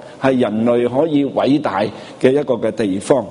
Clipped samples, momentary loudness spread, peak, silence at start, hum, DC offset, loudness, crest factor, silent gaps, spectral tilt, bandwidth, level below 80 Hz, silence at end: under 0.1%; 4 LU; 0 dBFS; 0 s; none; under 0.1%; -17 LUFS; 16 dB; none; -6.5 dB/octave; 11 kHz; -56 dBFS; 0 s